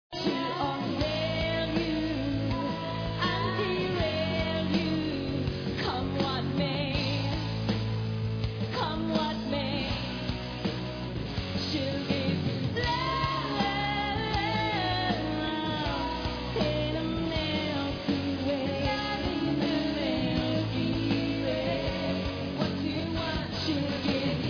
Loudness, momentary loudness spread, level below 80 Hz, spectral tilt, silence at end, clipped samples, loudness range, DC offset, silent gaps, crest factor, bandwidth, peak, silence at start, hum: -30 LUFS; 4 LU; -44 dBFS; -6.5 dB/octave; 0 s; under 0.1%; 2 LU; under 0.1%; none; 16 dB; 5.4 kHz; -14 dBFS; 0.1 s; none